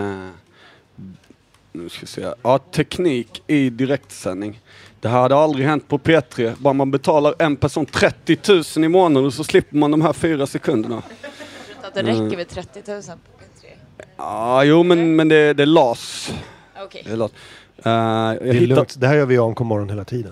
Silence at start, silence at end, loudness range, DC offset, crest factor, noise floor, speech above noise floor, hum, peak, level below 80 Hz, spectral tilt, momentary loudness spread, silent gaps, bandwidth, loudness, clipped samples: 0 s; 0 s; 8 LU; under 0.1%; 18 dB; -52 dBFS; 35 dB; none; 0 dBFS; -52 dBFS; -6 dB/octave; 19 LU; none; 14 kHz; -17 LUFS; under 0.1%